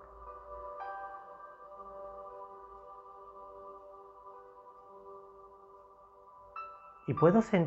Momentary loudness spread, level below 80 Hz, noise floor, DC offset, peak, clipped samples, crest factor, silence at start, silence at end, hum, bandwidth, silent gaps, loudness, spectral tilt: 21 LU; -66 dBFS; -58 dBFS; under 0.1%; -12 dBFS; under 0.1%; 26 dB; 0 s; 0 s; none; 8 kHz; none; -35 LUFS; -8.5 dB/octave